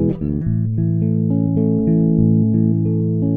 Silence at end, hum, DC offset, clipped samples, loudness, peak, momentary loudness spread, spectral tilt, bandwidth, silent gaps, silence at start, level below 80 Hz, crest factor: 0 s; none; under 0.1%; under 0.1%; -17 LUFS; -4 dBFS; 5 LU; -15.5 dB/octave; 1.9 kHz; none; 0 s; -38 dBFS; 12 dB